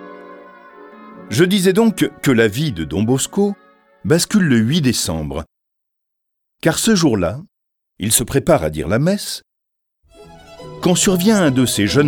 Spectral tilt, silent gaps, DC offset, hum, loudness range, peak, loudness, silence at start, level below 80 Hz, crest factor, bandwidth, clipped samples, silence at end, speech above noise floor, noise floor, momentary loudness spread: -4.5 dB/octave; none; under 0.1%; none; 3 LU; 0 dBFS; -16 LUFS; 0 s; -42 dBFS; 16 dB; 19 kHz; under 0.1%; 0 s; 61 dB; -76 dBFS; 13 LU